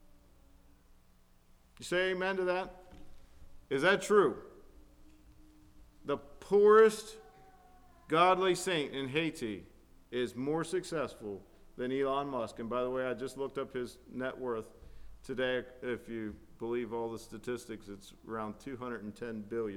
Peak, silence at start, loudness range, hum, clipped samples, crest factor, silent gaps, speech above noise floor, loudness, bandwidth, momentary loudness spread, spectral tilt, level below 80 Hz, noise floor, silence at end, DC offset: -12 dBFS; 1.8 s; 10 LU; none; under 0.1%; 22 dB; none; 31 dB; -33 LUFS; 14.5 kHz; 18 LU; -4.5 dB/octave; -60 dBFS; -63 dBFS; 0 s; under 0.1%